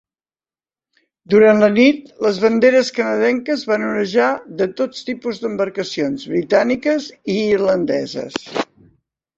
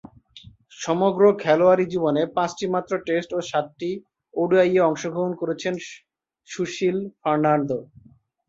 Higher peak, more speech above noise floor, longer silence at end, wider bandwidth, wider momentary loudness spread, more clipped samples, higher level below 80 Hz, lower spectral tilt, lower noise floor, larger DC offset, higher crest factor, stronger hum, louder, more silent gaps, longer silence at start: about the same, -2 dBFS vs -4 dBFS; first, over 74 dB vs 27 dB; about the same, 0.75 s vs 0.65 s; about the same, 7.8 kHz vs 7.8 kHz; about the same, 12 LU vs 13 LU; neither; first, -58 dBFS vs -64 dBFS; about the same, -5.5 dB/octave vs -6 dB/octave; first, under -90 dBFS vs -49 dBFS; neither; about the same, 16 dB vs 18 dB; neither; first, -17 LUFS vs -22 LUFS; neither; first, 1.3 s vs 0.35 s